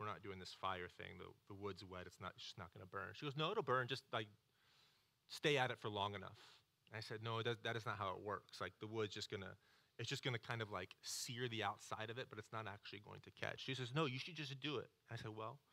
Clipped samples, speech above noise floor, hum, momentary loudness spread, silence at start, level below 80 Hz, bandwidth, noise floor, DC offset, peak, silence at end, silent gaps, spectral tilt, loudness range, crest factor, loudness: under 0.1%; 30 dB; none; 13 LU; 0 s; -84 dBFS; 16 kHz; -77 dBFS; under 0.1%; -24 dBFS; 0.15 s; none; -4 dB/octave; 4 LU; 24 dB; -47 LUFS